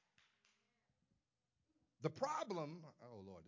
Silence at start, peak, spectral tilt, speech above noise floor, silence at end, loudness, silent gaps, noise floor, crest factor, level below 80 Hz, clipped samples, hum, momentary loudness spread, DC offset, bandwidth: 2 s; -26 dBFS; -5.5 dB/octave; 43 dB; 0 s; -45 LUFS; none; -90 dBFS; 24 dB; -84 dBFS; under 0.1%; none; 16 LU; under 0.1%; 7.6 kHz